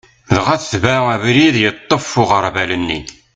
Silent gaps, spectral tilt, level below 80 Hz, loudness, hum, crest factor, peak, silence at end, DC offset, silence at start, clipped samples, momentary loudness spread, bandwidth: none; -5 dB/octave; -42 dBFS; -14 LUFS; none; 16 dB; 0 dBFS; 0.25 s; under 0.1%; 0.3 s; under 0.1%; 7 LU; 9.4 kHz